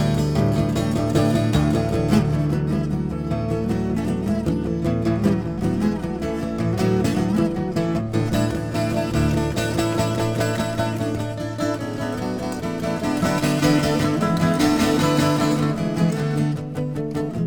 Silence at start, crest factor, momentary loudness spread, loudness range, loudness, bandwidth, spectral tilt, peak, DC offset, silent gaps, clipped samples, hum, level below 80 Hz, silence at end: 0 s; 16 dB; 7 LU; 4 LU; -22 LUFS; over 20 kHz; -6.5 dB/octave; -4 dBFS; under 0.1%; none; under 0.1%; none; -38 dBFS; 0 s